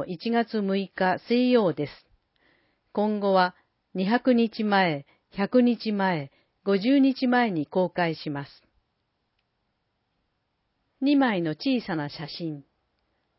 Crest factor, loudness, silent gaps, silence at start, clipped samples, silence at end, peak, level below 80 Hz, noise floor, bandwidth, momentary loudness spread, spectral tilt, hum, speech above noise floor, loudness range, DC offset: 18 dB; -25 LUFS; none; 0 s; under 0.1%; 0.75 s; -8 dBFS; -70 dBFS; -76 dBFS; 5.8 kHz; 13 LU; -10.5 dB/octave; none; 52 dB; 6 LU; under 0.1%